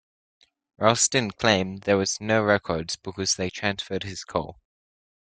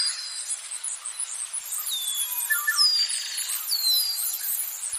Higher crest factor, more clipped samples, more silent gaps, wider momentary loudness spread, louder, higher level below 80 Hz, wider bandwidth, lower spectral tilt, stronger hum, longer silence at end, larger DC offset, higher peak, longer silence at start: first, 24 dB vs 18 dB; neither; neither; about the same, 10 LU vs 11 LU; about the same, -24 LUFS vs -24 LUFS; first, -58 dBFS vs -86 dBFS; second, 10.5 kHz vs 15.5 kHz; first, -3 dB/octave vs 7 dB/octave; neither; first, 0.85 s vs 0 s; neither; first, -2 dBFS vs -10 dBFS; first, 0.8 s vs 0 s